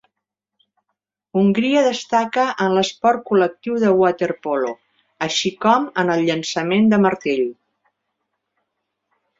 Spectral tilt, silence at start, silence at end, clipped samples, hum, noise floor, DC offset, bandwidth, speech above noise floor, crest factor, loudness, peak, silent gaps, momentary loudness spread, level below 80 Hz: -5 dB/octave; 1.35 s; 1.85 s; under 0.1%; 50 Hz at -45 dBFS; -81 dBFS; under 0.1%; 7.8 kHz; 63 dB; 18 dB; -18 LUFS; -2 dBFS; none; 7 LU; -64 dBFS